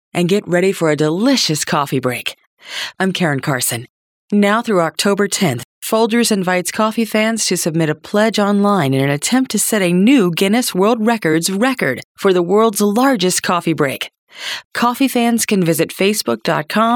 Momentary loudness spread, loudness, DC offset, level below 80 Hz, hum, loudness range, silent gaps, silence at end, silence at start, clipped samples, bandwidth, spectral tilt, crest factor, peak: 6 LU; -15 LUFS; under 0.1%; -64 dBFS; none; 3 LU; 2.47-2.57 s, 3.90-4.28 s, 5.65-5.82 s, 12.04-12.15 s, 14.18-14.27 s, 14.65-14.71 s; 0 s; 0.15 s; under 0.1%; 19.5 kHz; -4.5 dB/octave; 12 dB; -2 dBFS